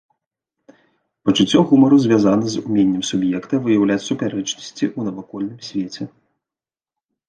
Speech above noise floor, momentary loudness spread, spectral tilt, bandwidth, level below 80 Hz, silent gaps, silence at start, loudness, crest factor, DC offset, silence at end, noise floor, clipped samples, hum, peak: over 73 dB; 15 LU; -5.5 dB/octave; 9.2 kHz; -58 dBFS; none; 1.25 s; -18 LUFS; 16 dB; under 0.1%; 1.2 s; under -90 dBFS; under 0.1%; none; -2 dBFS